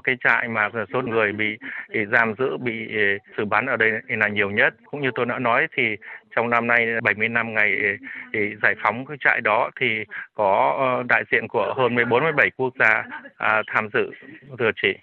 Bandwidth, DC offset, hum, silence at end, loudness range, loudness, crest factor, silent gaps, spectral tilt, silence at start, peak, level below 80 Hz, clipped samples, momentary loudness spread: 7 kHz; under 0.1%; none; 0.1 s; 2 LU; -21 LUFS; 18 dB; none; -7 dB/octave; 0.05 s; -4 dBFS; -68 dBFS; under 0.1%; 8 LU